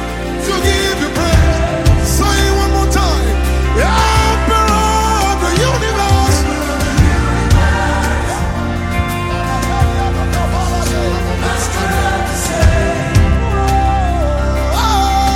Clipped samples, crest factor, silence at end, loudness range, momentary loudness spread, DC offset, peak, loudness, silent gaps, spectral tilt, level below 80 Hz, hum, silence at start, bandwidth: under 0.1%; 12 dB; 0 s; 3 LU; 5 LU; under 0.1%; 0 dBFS; -14 LUFS; none; -5 dB/octave; -16 dBFS; none; 0 s; 16 kHz